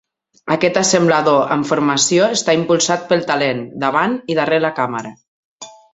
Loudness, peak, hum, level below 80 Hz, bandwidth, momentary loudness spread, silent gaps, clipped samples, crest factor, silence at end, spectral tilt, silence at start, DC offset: -16 LUFS; 0 dBFS; none; -58 dBFS; 8.4 kHz; 8 LU; 5.28-5.59 s; under 0.1%; 16 dB; 0.25 s; -3.5 dB/octave; 0.45 s; under 0.1%